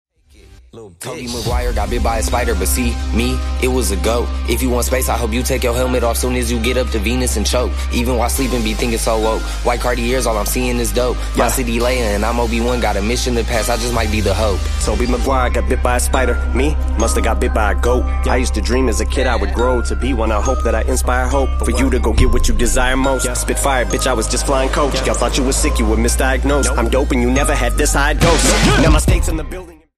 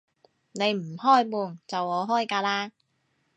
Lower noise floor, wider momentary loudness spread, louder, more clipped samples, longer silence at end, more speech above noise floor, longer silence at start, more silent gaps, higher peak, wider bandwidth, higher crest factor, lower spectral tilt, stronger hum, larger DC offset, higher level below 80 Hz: second, -45 dBFS vs -72 dBFS; second, 3 LU vs 11 LU; first, -16 LUFS vs -26 LUFS; neither; second, 0.25 s vs 0.7 s; second, 30 dB vs 47 dB; about the same, 0.5 s vs 0.55 s; neither; first, 0 dBFS vs -8 dBFS; first, 15 kHz vs 9.2 kHz; about the same, 16 dB vs 20 dB; about the same, -4.5 dB/octave vs -4.5 dB/octave; neither; neither; first, -18 dBFS vs -82 dBFS